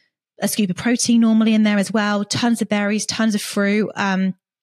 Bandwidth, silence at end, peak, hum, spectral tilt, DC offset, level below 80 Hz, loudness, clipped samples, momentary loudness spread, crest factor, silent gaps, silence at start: 14 kHz; 0.3 s; -6 dBFS; none; -4.5 dB/octave; under 0.1%; -64 dBFS; -18 LUFS; under 0.1%; 6 LU; 12 dB; none; 0.4 s